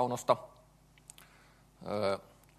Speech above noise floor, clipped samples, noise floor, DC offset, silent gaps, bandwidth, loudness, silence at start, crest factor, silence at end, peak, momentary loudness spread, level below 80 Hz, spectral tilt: 29 dB; under 0.1%; -62 dBFS; under 0.1%; none; 13 kHz; -34 LUFS; 0 s; 26 dB; 0.4 s; -12 dBFS; 24 LU; -68 dBFS; -5 dB/octave